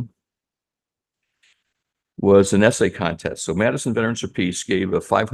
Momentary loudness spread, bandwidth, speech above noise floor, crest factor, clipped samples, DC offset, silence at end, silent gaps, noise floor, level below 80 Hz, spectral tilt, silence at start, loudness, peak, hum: 10 LU; 12.5 kHz; 70 dB; 20 dB; under 0.1%; under 0.1%; 0 s; none; -88 dBFS; -52 dBFS; -5 dB/octave; 0 s; -20 LUFS; -2 dBFS; none